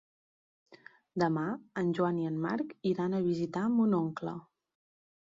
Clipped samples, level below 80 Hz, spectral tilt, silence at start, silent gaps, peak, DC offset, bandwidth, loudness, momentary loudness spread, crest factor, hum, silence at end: under 0.1%; -74 dBFS; -8.5 dB/octave; 0.7 s; none; -16 dBFS; under 0.1%; 7.6 kHz; -32 LUFS; 10 LU; 18 dB; none; 0.85 s